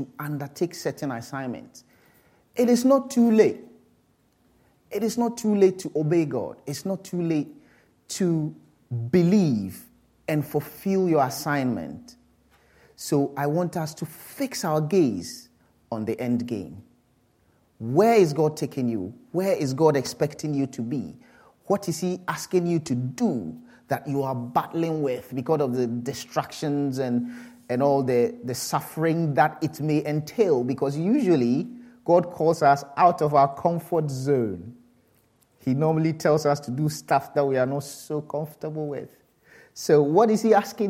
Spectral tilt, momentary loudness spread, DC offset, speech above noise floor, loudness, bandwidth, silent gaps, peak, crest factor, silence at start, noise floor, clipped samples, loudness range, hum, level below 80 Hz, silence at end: -6.5 dB/octave; 13 LU; under 0.1%; 41 dB; -24 LUFS; 16.5 kHz; none; -6 dBFS; 20 dB; 0 s; -64 dBFS; under 0.1%; 5 LU; none; -68 dBFS; 0 s